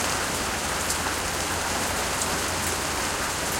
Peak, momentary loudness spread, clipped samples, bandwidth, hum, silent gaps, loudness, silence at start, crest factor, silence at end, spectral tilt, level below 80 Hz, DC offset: -10 dBFS; 1 LU; under 0.1%; 17 kHz; none; none; -25 LUFS; 0 s; 16 dB; 0 s; -2 dB/octave; -44 dBFS; under 0.1%